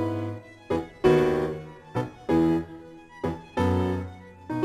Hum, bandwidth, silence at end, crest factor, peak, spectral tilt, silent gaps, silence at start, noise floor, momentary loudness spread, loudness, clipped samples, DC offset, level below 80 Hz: none; 13.5 kHz; 0 s; 20 dB; -8 dBFS; -8 dB/octave; none; 0 s; -45 dBFS; 19 LU; -27 LUFS; under 0.1%; under 0.1%; -54 dBFS